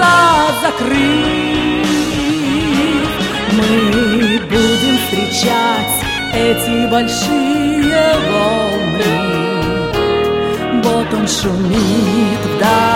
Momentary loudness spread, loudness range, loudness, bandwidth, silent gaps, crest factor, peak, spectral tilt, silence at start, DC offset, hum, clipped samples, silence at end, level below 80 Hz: 4 LU; 1 LU; -13 LUFS; 16.5 kHz; none; 14 dB; 0 dBFS; -4.5 dB/octave; 0 s; under 0.1%; none; under 0.1%; 0 s; -34 dBFS